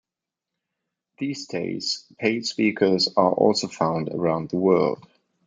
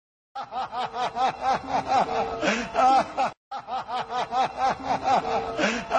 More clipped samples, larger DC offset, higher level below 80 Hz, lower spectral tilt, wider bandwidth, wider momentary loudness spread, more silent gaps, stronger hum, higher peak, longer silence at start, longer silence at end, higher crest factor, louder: neither; neither; second, -68 dBFS vs -54 dBFS; about the same, -5 dB/octave vs -4 dB/octave; about the same, 9.4 kHz vs 9.4 kHz; about the same, 10 LU vs 11 LU; second, none vs 3.37-3.51 s; neither; first, -4 dBFS vs -10 dBFS; first, 1.2 s vs 0.35 s; first, 0.5 s vs 0 s; about the same, 20 dB vs 16 dB; first, -23 LUFS vs -26 LUFS